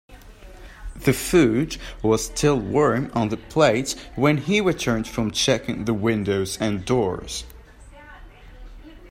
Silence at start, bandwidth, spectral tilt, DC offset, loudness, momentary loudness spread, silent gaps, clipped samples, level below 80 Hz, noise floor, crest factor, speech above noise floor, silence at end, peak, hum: 0.1 s; 16 kHz; -5 dB/octave; under 0.1%; -22 LUFS; 10 LU; none; under 0.1%; -42 dBFS; -45 dBFS; 18 dB; 23 dB; 0 s; -4 dBFS; none